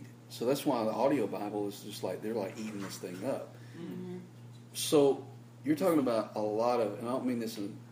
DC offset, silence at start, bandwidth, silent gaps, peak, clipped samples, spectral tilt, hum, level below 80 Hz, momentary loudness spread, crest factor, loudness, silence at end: under 0.1%; 0 s; 15.5 kHz; none; -14 dBFS; under 0.1%; -5.5 dB/octave; none; -80 dBFS; 16 LU; 20 dB; -33 LUFS; 0 s